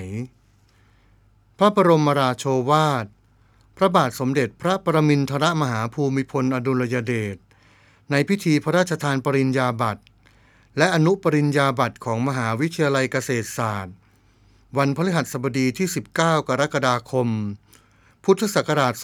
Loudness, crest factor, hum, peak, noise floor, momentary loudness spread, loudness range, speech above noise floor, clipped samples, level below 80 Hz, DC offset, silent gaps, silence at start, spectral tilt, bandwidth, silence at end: -21 LUFS; 20 dB; none; -2 dBFS; -57 dBFS; 9 LU; 3 LU; 37 dB; under 0.1%; -60 dBFS; under 0.1%; none; 0 s; -6 dB/octave; 18 kHz; 0 s